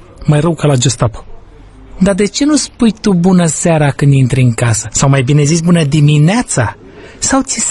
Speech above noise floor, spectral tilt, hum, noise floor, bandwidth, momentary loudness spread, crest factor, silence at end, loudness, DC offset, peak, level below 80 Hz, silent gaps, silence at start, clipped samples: 25 dB; -5.5 dB/octave; none; -35 dBFS; 11.5 kHz; 5 LU; 10 dB; 0 s; -11 LUFS; under 0.1%; 0 dBFS; -34 dBFS; none; 0.2 s; under 0.1%